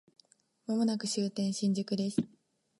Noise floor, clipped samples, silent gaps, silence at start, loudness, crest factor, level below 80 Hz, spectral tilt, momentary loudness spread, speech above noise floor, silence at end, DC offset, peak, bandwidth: -67 dBFS; under 0.1%; none; 0.7 s; -33 LUFS; 20 dB; -76 dBFS; -5.5 dB/octave; 6 LU; 35 dB; 0.55 s; under 0.1%; -14 dBFS; 11.5 kHz